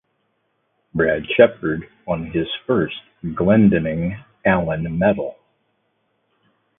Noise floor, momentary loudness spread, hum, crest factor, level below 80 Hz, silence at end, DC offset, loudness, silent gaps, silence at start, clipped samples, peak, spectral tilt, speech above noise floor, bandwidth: -69 dBFS; 13 LU; none; 20 dB; -44 dBFS; 1.45 s; under 0.1%; -20 LUFS; none; 0.95 s; under 0.1%; 0 dBFS; -11.5 dB/octave; 50 dB; 3.8 kHz